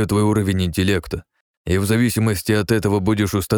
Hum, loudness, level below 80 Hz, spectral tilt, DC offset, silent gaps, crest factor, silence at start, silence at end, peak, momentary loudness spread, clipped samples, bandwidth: none; -19 LUFS; -40 dBFS; -6 dB/octave; under 0.1%; 1.41-1.65 s; 16 dB; 0 s; 0 s; -4 dBFS; 6 LU; under 0.1%; 19.5 kHz